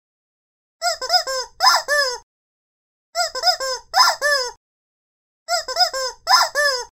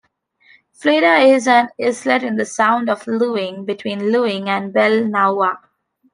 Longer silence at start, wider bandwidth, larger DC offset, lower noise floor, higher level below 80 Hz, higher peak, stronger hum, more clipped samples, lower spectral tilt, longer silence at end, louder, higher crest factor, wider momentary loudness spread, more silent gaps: about the same, 0.8 s vs 0.8 s; first, 16 kHz vs 10.5 kHz; neither; first, under -90 dBFS vs -55 dBFS; first, -58 dBFS vs -70 dBFS; about the same, 0 dBFS vs -2 dBFS; neither; neither; second, 3 dB/octave vs -4.5 dB/octave; second, 0.05 s vs 0.55 s; about the same, -18 LUFS vs -16 LUFS; about the same, 20 dB vs 16 dB; about the same, 10 LU vs 10 LU; first, 2.23-3.13 s, 4.57-5.46 s vs none